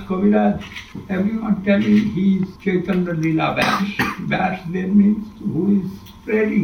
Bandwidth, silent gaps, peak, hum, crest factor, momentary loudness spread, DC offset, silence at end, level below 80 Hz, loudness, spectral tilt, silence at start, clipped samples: 15.5 kHz; none; -4 dBFS; none; 14 dB; 9 LU; under 0.1%; 0 s; -46 dBFS; -19 LUFS; -7.5 dB/octave; 0 s; under 0.1%